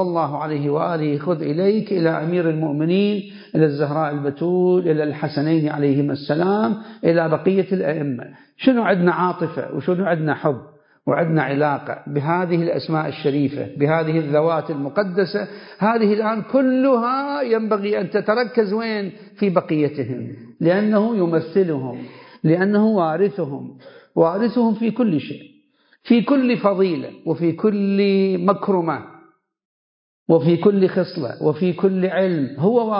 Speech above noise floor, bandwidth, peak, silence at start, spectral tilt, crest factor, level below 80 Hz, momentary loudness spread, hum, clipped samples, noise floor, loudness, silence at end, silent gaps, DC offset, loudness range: 39 dB; 5.4 kHz; -2 dBFS; 0 s; -12.5 dB/octave; 18 dB; -68 dBFS; 9 LU; none; under 0.1%; -58 dBFS; -20 LUFS; 0 s; 29.65-30.26 s; under 0.1%; 2 LU